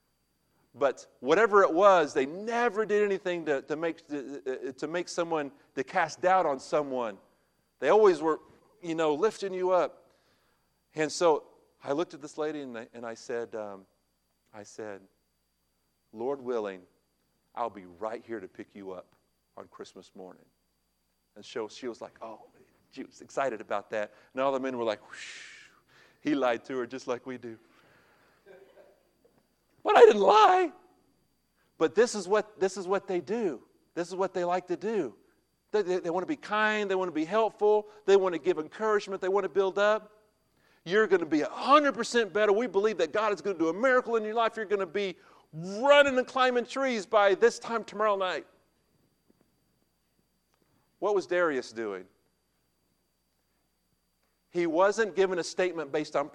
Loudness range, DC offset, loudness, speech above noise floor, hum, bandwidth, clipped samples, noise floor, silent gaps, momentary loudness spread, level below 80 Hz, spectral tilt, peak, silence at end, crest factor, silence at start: 16 LU; under 0.1%; -28 LUFS; 48 dB; none; 10.5 kHz; under 0.1%; -76 dBFS; none; 20 LU; -76 dBFS; -4 dB/octave; -6 dBFS; 0.05 s; 24 dB; 0.75 s